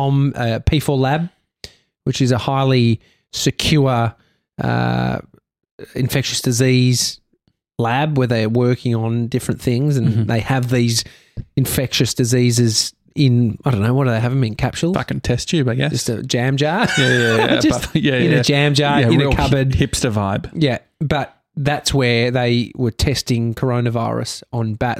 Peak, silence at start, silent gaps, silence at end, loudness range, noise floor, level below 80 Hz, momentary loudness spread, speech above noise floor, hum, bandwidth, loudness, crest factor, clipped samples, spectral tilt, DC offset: -2 dBFS; 0 s; 5.71-5.78 s; 0 s; 4 LU; -64 dBFS; -38 dBFS; 8 LU; 48 dB; none; 15.5 kHz; -17 LUFS; 14 dB; under 0.1%; -5 dB/octave; under 0.1%